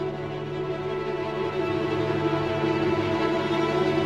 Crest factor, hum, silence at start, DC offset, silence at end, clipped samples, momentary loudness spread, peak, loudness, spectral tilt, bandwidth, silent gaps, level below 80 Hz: 14 dB; none; 0 s; under 0.1%; 0 s; under 0.1%; 7 LU; -12 dBFS; -26 LUFS; -7 dB/octave; 9.8 kHz; none; -52 dBFS